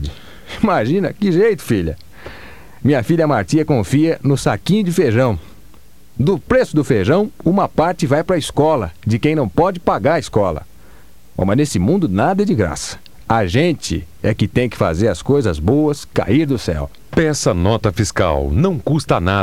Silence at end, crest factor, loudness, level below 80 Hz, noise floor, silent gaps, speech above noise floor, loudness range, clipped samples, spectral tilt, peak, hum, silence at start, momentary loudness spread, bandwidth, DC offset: 0 s; 16 dB; -16 LUFS; -34 dBFS; -47 dBFS; none; 31 dB; 2 LU; under 0.1%; -6.5 dB/octave; 0 dBFS; none; 0 s; 7 LU; 16 kHz; 1%